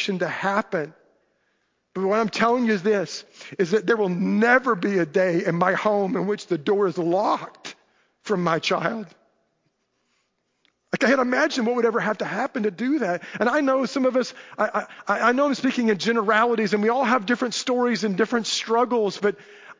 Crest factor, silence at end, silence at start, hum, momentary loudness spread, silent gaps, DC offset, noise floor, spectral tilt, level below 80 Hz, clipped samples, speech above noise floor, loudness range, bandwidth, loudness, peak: 20 dB; 0.05 s; 0 s; none; 9 LU; none; under 0.1%; -72 dBFS; -5 dB/octave; -72 dBFS; under 0.1%; 50 dB; 4 LU; 7.6 kHz; -22 LUFS; -4 dBFS